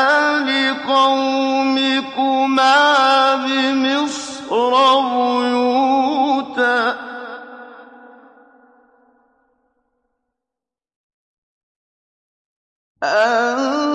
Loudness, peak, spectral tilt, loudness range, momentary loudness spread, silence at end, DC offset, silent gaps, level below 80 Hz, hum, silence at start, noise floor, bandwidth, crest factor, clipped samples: -16 LUFS; -2 dBFS; -2 dB/octave; 10 LU; 10 LU; 0 s; under 0.1%; 10.96-12.95 s; -70 dBFS; none; 0 s; -87 dBFS; 10.5 kHz; 16 dB; under 0.1%